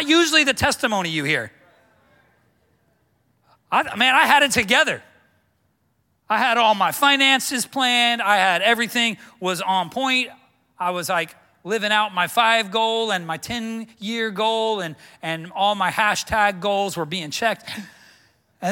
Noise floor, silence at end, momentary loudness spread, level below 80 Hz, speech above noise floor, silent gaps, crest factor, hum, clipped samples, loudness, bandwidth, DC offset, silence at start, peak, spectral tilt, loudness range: -67 dBFS; 0 s; 13 LU; -56 dBFS; 47 dB; none; 20 dB; none; under 0.1%; -19 LUFS; 17 kHz; under 0.1%; 0 s; -2 dBFS; -2.5 dB/octave; 5 LU